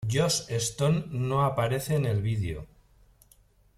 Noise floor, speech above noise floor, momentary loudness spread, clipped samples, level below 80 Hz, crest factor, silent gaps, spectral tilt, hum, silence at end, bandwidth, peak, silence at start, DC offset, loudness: -61 dBFS; 34 dB; 5 LU; under 0.1%; -52 dBFS; 16 dB; none; -5 dB/octave; none; 1.15 s; 15.5 kHz; -12 dBFS; 0 s; under 0.1%; -28 LUFS